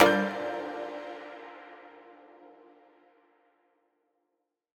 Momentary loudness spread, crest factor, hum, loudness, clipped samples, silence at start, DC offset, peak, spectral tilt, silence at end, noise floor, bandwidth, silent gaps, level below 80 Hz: 25 LU; 32 dB; none; -32 LUFS; under 0.1%; 0 s; under 0.1%; -2 dBFS; -4.5 dB/octave; 2.3 s; -82 dBFS; 17.5 kHz; none; -70 dBFS